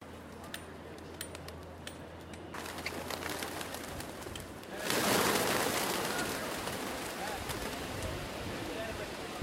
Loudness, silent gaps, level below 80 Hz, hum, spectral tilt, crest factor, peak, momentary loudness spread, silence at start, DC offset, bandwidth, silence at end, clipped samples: -36 LUFS; none; -56 dBFS; none; -3 dB/octave; 26 dB; -12 dBFS; 16 LU; 0 s; under 0.1%; 16.5 kHz; 0 s; under 0.1%